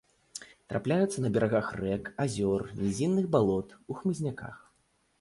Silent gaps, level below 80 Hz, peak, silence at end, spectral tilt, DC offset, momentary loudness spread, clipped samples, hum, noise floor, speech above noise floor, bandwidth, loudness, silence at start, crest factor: none; -58 dBFS; -12 dBFS; 0.65 s; -6.5 dB/octave; under 0.1%; 17 LU; under 0.1%; none; -71 dBFS; 42 dB; 11.5 kHz; -30 LUFS; 0.35 s; 20 dB